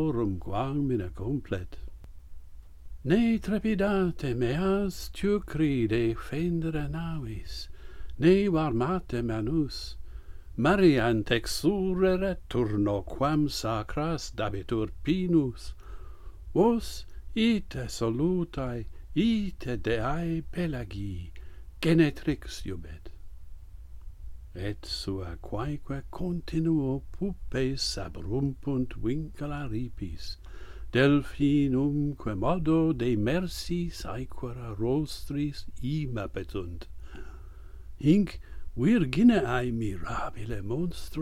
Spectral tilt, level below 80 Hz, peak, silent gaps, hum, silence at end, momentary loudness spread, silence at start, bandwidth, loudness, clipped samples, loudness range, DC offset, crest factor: -6.5 dB/octave; -42 dBFS; -10 dBFS; none; none; 0 s; 19 LU; 0 s; 15.5 kHz; -29 LUFS; under 0.1%; 7 LU; under 0.1%; 20 dB